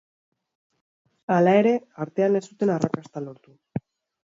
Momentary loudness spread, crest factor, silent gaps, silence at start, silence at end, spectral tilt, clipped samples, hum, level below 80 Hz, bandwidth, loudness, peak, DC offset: 18 LU; 20 dB; none; 1.3 s; 0.45 s; -7.5 dB/octave; under 0.1%; none; -68 dBFS; 7.8 kHz; -23 LUFS; -6 dBFS; under 0.1%